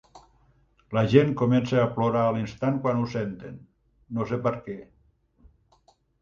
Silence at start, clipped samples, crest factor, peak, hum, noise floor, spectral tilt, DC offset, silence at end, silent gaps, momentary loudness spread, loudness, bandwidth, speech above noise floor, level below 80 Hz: 0.15 s; under 0.1%; 22 dB; -4 dBFS; none; -64 dBFS; -8 dB/octave; under 0.1%; 1.4 s; none; 16 LU; -25 LUFS; 7.2 kHz; 39 dB; -56 dBFS